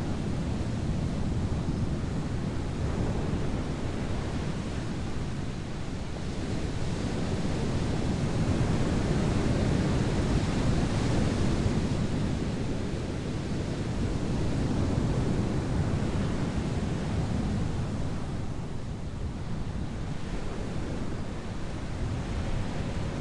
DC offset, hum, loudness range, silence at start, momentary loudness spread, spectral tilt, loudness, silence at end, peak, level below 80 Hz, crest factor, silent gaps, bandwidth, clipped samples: under 0.1%; none; 7 LU; 0 s; 8 LU; -6.5 dB/octave; -31 LUFS; 0 s; -14 dBFS; -36 dBFS; 16 dB; none; 11.5 kHz; under 0.1%